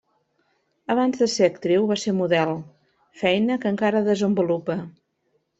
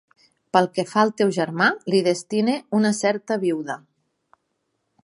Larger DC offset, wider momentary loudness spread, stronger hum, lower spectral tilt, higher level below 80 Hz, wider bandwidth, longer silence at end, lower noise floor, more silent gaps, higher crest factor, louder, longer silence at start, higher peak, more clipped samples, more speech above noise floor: neither; first, 9 LU vs 5 LU; neither; about the same, -5.5 dB/octave vs -5 dB/octave; first, -66 dBFS vs -72 dBFS; second, 8.2 kHz vs 11.5 kHz; second, 0.7 s vs 1.25 s; second, -70 dBFS vs -74 dBFS; neither; about the same, 18 dB vs 20 dB; about the same, -22 LUFS vs -21 LUFS; first, 0.9 s vs 0.55 s; about the same, -4 dBFS vs -2 dBFS; neither; second, 49 dB vs 53 dB